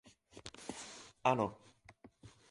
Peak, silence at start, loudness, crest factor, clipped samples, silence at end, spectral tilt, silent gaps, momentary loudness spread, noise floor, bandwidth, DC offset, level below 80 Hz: -14 dBFS; 0.35 s; -38 LUFS; 26 dB; under 0.1%; 0.25 s; -5 dB/octave; none; 26 LU; -63 dBFS; 11.5 kHz; under 0.1%; -70 dBFS